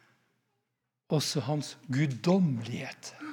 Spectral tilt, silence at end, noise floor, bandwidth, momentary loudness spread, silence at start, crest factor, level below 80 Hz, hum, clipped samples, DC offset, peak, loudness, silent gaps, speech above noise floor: -5.5 dB/octave; 0 s; -83 dBFS; 18 kHz; 12 LU; 1.1 s; 20 dB; -78 dBFS; none; under 0.1%; under 0.1%; -12 dBFS; -30 LUFS; none; 53 dB